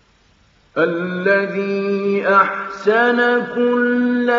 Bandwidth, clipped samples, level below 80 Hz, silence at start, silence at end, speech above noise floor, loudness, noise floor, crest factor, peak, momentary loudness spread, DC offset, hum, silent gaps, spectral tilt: 7.4 kHz; under 0.1%; -64 dBFS; 0.75 s; 0 s; 38 dB; -17 LUFS; -55 dBFS; 16 dB; 0 dBFS; 6 LU; under 0.1%; none; none; -4 dB/octave